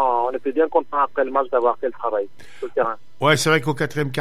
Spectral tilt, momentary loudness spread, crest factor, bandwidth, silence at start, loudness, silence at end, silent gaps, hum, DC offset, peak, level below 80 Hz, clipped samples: -4.5 dB/octave; 8 LU; 18 dB; 15 kHz; 0 s; -21 LUFS; 0 s; none; none; 2%; -4 dBFS; -62 dBFS; under 0.1%